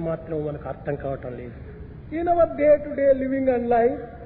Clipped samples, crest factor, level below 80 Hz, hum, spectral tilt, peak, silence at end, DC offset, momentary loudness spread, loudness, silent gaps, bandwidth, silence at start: under 0.1%; 16 dB; -44 dBFS; none; -12 dB/octave; -8 dBFS; 0 s; under 0.1%; 18 LU; -23 LUFS; none; 4.2 kHz; 0 s